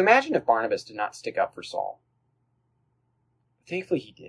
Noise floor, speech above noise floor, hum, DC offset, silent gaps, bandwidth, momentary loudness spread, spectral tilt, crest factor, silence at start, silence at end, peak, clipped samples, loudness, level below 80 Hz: -72 dBFS; 46 dB; none; under 0.1%; none; 11 kHz; 13 LU; -4.5 dB/octave; 24 dB; 0 s; 0 s; -4 dBFS; under 0.1%; -27 LUFS; -72 dBFS